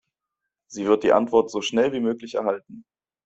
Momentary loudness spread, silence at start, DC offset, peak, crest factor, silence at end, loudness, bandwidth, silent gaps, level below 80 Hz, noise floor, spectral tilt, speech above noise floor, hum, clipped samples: 10 LU; 0.7 s; under 0.1%; -4 dBFS; 18 dB; 0.45 s; -22 LUFS; 8 kHz; none; -64 dBFS; -84 dBFS; -4.5 dB/octave; 62 dB; none; under 0.1%